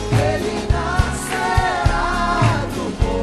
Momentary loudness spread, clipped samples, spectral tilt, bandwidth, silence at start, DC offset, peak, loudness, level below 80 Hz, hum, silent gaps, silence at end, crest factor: 5 LU; under 0.1%; -5.5 dB/octave; 13 kHz; 0 s; under 0.1%; -4 dBFS; -19 LUFS; -26 dBFS; none; none; 0 s; 14 dB